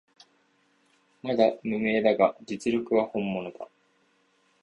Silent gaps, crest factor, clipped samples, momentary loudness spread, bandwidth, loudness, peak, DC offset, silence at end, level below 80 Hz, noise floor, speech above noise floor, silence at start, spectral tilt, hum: none; 22 dB; under 0.1%; 16 LU; 11 kHz; -26 LUFS; -8 dBFS; under 0.1%; 0.95 s; -66 dBFS; -67 dBFS; 42 dB; 1.25 s; -6 dB/octave; none